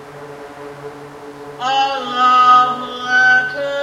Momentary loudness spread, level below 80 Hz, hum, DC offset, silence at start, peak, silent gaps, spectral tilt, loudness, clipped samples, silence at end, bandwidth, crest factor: 24 LU; -60 dBFS; none; under 0.1%; 0 s; -2 dBFS; none; -2.5 dB/octave; -13 LUFS; under 0.1%; 0 s; 12 kHz; 14 dB